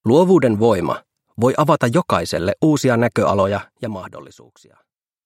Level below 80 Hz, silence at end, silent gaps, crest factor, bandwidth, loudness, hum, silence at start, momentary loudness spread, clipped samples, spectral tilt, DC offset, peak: -54 dBFS; 1.05 s; none; 18 dB; 16 kHz; -17 LUFS; none; 0.05 s; 15 LU; under 0.1%; -6.5 dB/octave; under 0.1%; 0 dBFS